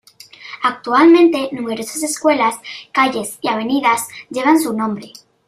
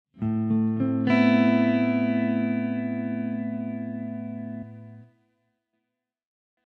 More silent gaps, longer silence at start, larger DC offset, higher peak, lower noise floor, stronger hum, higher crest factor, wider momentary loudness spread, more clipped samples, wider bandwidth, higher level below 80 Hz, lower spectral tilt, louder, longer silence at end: neither; first, 0.4 s vs 0.15 s; neither; first, -2 dBFS vs -10 dBFS; second, -39 dBFS vs -83 dBFS; neither; about the same, 14 dB vs 16 dB; about the same, 13 LU vs 15 LU; neither; first, 15.5 kHz vs 6 kHz; about the same, -64 dBFS vs -66 dBFS; second, -3.5 dB/octave vs -9 dB/octave; first, -16 LUFS vs -25 LUFS; second, 0.4 s vs 1.65 s